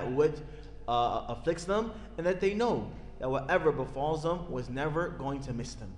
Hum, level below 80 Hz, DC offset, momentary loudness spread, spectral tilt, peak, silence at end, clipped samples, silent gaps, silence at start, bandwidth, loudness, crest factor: none; -48 dBFS; under 0.1%; 10 LU; -6 dB/octave; -14 dBFS; 0 s; under 0.1%; none; 0 s; 10.5 kHz; -32 LUFS; 16 dB